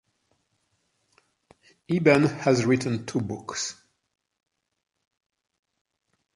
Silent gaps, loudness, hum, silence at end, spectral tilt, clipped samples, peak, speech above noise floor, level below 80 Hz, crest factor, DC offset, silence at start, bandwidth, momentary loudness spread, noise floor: none; -24 LUFS; none; 2.65 s; -5.5 dB/octave; under 0.1%; -4 dBFS; 50 dB; -64 dBFS; 24 dB; under 0.1%; 1.9 s; 11.5 kHz; 12 LU; -73 dBFS